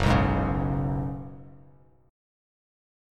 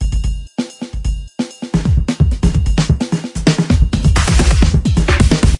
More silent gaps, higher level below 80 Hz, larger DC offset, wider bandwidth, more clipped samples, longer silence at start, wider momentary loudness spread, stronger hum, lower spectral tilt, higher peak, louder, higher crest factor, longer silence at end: neither; second, -38 dBFS vs -16 dBFS; neither; about the same, 11 kHz vs 11.5 kHz; neither; about the same, 0 s vs 0 s; first, 20 LU vs 11 LU; neither; first, -7.5 dB/octave vs -5.5 dB/octave; second, -8 dBFS vs 0 dBFS; second, -27 LUFS vs -15 LUFS; first, 20 dB vs 14 dB; first, 1.55 s vs 0 s